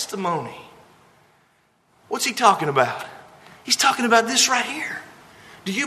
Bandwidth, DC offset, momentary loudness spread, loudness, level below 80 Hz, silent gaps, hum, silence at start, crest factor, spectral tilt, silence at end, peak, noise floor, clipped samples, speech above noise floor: 13.5 kHz; under 0.1%; 19 LU; -20 LUFS; -70 dBFS; none; none; 0 s; 22 dB; -2 dB/octave; 0 s; 0 dBFS; -62 dBFS; under 0.1%; 41 dB